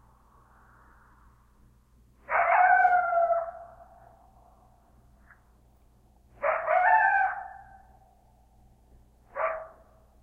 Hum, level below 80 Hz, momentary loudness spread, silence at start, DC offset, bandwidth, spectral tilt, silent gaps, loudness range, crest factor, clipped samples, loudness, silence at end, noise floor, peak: none; -62 dBFS; 20 LU; 2.3 s; under 0.1%; 3.7 kHz; -5 dB/octave; none; 8 LU; 20 dB; under 0.1%; -25 LUFS; 0.55 s; -60 dBFS; -10 dBFS